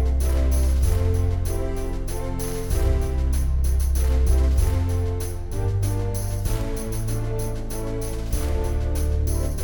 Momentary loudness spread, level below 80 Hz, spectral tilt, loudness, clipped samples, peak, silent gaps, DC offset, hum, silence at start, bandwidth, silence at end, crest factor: 8 LU; -22 dBFS; -6.5 dB/octave; -25 LUFS; under 0.1%; -8 dBFS; none; under 0.1%; none; 0 s; over 20 kHz; 0 s; 12 dB